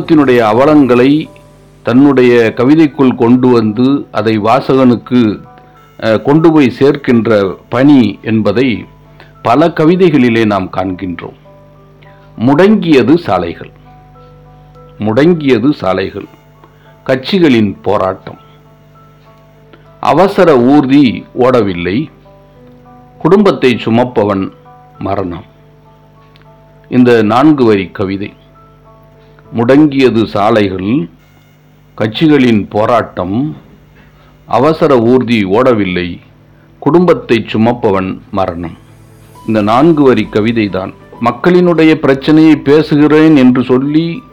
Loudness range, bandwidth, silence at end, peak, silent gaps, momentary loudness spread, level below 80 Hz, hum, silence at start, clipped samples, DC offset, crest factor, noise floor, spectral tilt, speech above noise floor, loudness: 5 LU; 9.6 kHz; 0.1 s; 0 dBFS; none; 12 LU; -44 dBFS; 50 Hz at -40 dBFS; 0 s; 2%; under 0.1%; 10 dB; -43 dBFS; -8 dB/octave; 34 dB; -9 LUFS